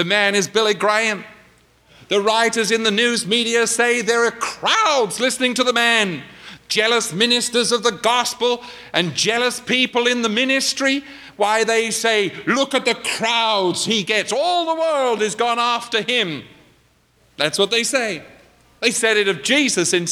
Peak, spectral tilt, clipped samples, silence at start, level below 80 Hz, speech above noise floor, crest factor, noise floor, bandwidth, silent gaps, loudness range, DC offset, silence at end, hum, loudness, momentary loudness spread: -2 dBFS; -2 dB/octave; under 0.1%; 0 s; -62 dBFS; 39 dB; 18 dB; -57 dBFS; 16 kHz; none; 3 LU; under 0.1%; 0 s; none; -18 LUFS; 6 LU